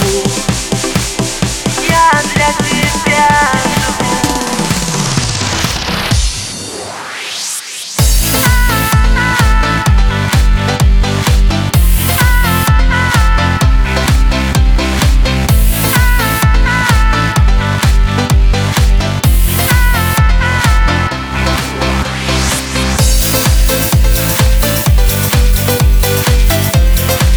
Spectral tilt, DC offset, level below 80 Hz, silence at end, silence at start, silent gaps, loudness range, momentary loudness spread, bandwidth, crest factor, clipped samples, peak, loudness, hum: -4 dB/octave; under 0.1%; -12 dBFS; 0 s; 0 s; none; 2 LU; 4 LU; over 20 kHz; 10 dB; under 0.1%; 0 dBFS; -11 LUFS; none